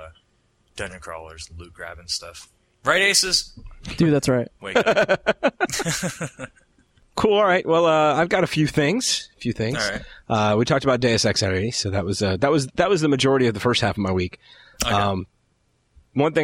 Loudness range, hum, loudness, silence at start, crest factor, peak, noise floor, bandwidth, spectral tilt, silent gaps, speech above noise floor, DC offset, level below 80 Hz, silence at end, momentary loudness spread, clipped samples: 3 LU; none; -21 LUFS; 0 s; 20 dB; -2 dBFS; -66 dBFS; 16 kHz; -4 dB/octave; none; 45 dB; under 0.1%; -48 dBFS; 0 s; 18 LU; under 0.1%